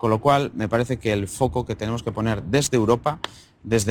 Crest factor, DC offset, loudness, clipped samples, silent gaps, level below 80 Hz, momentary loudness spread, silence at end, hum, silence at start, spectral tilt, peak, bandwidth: 16 dB; under 0.1%; -23 LUFS; under 0.1%; none; -46 dBFS; 8 LU; 0 s; none; 0 s; -5.5 dB/octave; -6 dBFS; 18.5 kHz